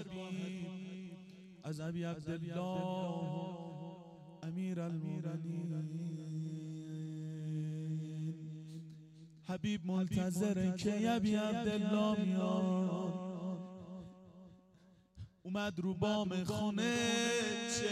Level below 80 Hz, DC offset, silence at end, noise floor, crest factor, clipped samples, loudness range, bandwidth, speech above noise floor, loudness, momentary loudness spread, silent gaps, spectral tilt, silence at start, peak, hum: -70 dBFS; under 0.1%; 0 s; -66 dBFS; 18 dB; under 0.1%; 8 LU; 13.5 kHz; 29 dB; -38 LUFS; 17 LU; none; -5.5 dB/octave; 0 s; -20 dBFS; none